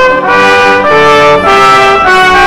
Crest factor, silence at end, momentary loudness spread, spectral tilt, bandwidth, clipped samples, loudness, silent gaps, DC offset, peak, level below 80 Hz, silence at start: 4 dB; 0 s; 2 LU; -3.5 dB/octave; 18 kHz; 2%; -4 LUFS; none; under 0.1%; 0 dBFS; -32 dBFS; 0 s